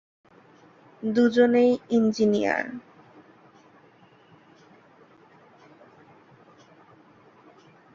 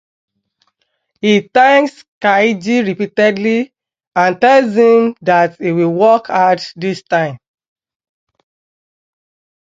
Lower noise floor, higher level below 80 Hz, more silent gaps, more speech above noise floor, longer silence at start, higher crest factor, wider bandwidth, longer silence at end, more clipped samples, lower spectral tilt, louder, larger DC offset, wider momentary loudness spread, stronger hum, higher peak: second, -56 dBFS vs -67 dBFS; second, -70 dBFS vs -64 dBFS; second, none vs 2.08-2.21 s, 4.07-4.11 s; second, 34 dB vs 55 dB; second, 1 s vs 1.25 s; first, 20 dB vs 14 dB; about the same, 7.4 kHz vs 7.8 kHz; first, 5.15 s vs 2.25 s; neither; about the same, -6 dB/octave vs -6 dB/octave; second, -23 LUFS vs -13 LUFS; neither; first, 15 LU vs 9 LU; neither; second, -8 dBFS vs 0 dBFS